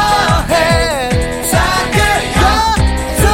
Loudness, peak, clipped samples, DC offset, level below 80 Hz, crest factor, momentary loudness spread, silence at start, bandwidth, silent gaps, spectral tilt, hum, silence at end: -12 LUFS; 0 dBFS; under 0.1%; under 0.1%; -20 dBFS; 12 dB; 4 LU; 0 s; 17 kHz; none; -4 dB/octave; none; 0 s